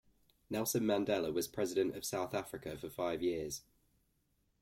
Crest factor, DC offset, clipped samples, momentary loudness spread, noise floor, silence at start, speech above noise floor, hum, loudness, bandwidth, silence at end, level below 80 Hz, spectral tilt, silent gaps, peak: 18 dB; under 0.1%; under 0.1%; 11 LU; -78 dBFS; 0.5 s; 41 dB; none; -37 LUFS; 16.5 kHz; 1 s; -68 dBFS; -4.5 dB/octave; none; -20 dBFS